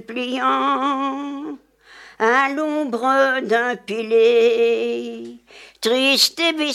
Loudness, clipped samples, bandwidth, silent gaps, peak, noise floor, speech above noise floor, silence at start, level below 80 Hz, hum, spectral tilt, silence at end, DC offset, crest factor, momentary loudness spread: -18 LUFS; under 0.1%; 15.5 kHz; none; -4 dBFS; -46 dBFS; 27 dB; 0.1 s; -70 dBFS; none; -2 dB/octave; 0 s; under 0.1%; 16 dB; 15 LU